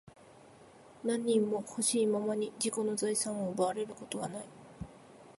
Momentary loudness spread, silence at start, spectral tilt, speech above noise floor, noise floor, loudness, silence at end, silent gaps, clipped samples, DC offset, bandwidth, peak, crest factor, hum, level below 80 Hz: 18 LU; 0.05 s; -4 dB/octave; 24 dB; -57 dBFS; -33 LUFS; 0.1 s; none; under 0.1%; under 0.1%; 12 kHz; -18 dBFS; 16 dB; none; -68 dBFS